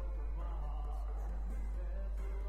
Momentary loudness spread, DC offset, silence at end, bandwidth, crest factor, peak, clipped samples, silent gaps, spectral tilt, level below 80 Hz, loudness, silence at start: 0 LU; under 0.1%; 0 s; 3.2 kHz; 8 dB; -32 dBFS; under 0.1%; none; -8 dB/octave; -38 dBFS; -43 LUFS; 0 s